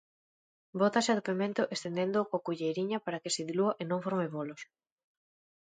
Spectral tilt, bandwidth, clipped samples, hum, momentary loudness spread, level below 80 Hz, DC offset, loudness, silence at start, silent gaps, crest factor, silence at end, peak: -4.5 dB/octave; 9.6 kHz; under 0.1%; none; 10 LU; -80 dBFS; under 0.1%; -32 LUFS; 0.75 s; none; 20 dB; 1.1 s; -14 dBFS